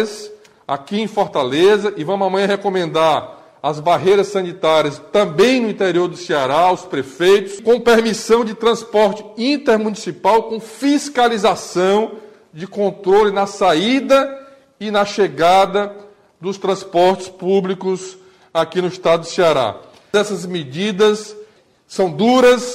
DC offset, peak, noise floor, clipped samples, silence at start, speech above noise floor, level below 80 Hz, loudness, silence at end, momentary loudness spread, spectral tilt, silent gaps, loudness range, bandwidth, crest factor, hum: under 0.1%; -4 dBFS; -47 dBFS; under 0.1%; 0 s; 31 dB; -54 dBFS; -16 LUFS; 0 s; 11 LU; -4.5 dB/octave; none; 3 LU; 15 kHz; 14 dB; none